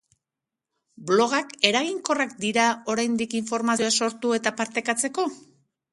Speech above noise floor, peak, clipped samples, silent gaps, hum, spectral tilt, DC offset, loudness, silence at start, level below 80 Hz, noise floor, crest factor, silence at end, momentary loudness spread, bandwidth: 63 dB; 0 dBFS; under 0.1%; none; none; -2.5 dB/octave; under 0.1%; -24 LUFS; 1 s; -72 dBFS; -87 dBFS; 26 dB; 0.55 s; 6 LU; 11.5 kHz